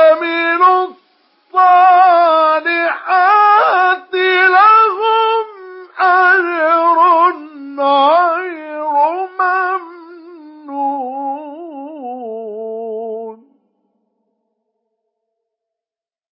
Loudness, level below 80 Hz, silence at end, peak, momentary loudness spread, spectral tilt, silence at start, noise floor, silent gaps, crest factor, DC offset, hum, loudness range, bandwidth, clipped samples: -12 LUFS; under -90 dBFS; 3 s; 0 dBFS; 18 LU; -6.5 dB/octave; 0 s; under -90 dBFS; none; 14 dB; under 0.1%; none; 17 LU; 5.8 kHz; under 0.1%